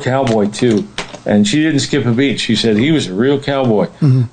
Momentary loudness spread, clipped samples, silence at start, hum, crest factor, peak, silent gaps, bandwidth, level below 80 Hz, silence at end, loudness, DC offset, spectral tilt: 3 LU; under 0.1%; 0 s; none; 12 dB; 0 dBFS; none; 9.4 kHz; -46 dBFS; 0.05 s; -14 LUFS; under 0.1%; -6 dB/octave